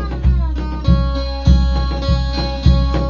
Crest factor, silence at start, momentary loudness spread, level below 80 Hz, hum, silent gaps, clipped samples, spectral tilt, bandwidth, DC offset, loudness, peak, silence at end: 14 dB; 0 s; 6 LU; -16 dBFS; none; none; under 0.1%; -7.5 dB/octave; 7 kHz; under 0.1%; -17 LUFS; 0 dBFS; 0 s